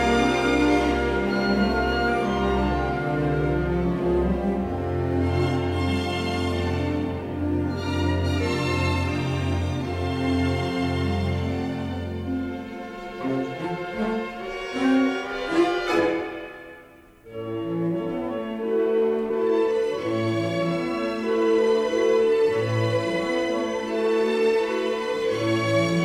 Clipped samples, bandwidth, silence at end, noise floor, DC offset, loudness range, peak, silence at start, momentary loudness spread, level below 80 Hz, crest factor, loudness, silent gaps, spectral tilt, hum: under 0.1%; 14.5 kHz; 0 s; -49 dBFS; under 0.1%; 5 LU; -8 dBFS; 0 s; 9 LU; -40 dBFS; 16 dB; -24 LUFS; none; -6.5 dB/octave; none